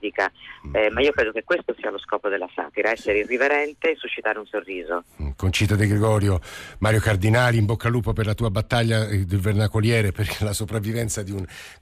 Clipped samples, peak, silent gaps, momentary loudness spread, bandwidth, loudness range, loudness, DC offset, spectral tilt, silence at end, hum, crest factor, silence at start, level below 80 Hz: under 0.1%; -8 dBFS; none; 9 LU; 15 kHz; 3 LU; -23 LUFS; under 0.1%; -5.5 dB/octave; 0.1 s; none; 14 dB; 0 s; -40 dBFS